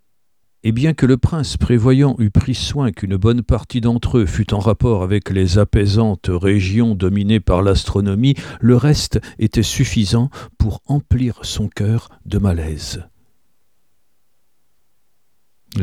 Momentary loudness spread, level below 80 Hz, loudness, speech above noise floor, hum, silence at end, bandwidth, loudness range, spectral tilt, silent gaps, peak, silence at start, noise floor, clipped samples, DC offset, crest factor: 8 LU; -30 dBFS; -17 LUFS; 57 dB; none; 0 s; 13.5 kHz; 8 LU; -6.5 dB/octave; none; 0 dBFS; 0.65 s; -73 dBFS; under 0.1%; 0.2%; 16 dB